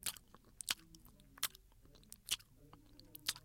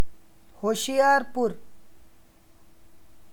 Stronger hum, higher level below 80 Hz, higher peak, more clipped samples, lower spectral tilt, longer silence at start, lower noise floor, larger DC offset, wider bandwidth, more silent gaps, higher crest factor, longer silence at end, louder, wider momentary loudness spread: neither; second, -68 dBFS vs -58 dBFS; second, -14 dBFS vs -8 dBFS; neither; second, 0.5 dB/octave vs -3 dB/octave; about the same, 0 s vs 0 s; first, -64 dBFS vs -57 dBFS; neither; second, 17 kHz vs 19.5 kHz; neither; first, 34 dB vs 18 dB; about the same, 0.05 s vs 0 s; second, -43 LUFS vs -25 LUFS; first, 21 LU vs 15 LU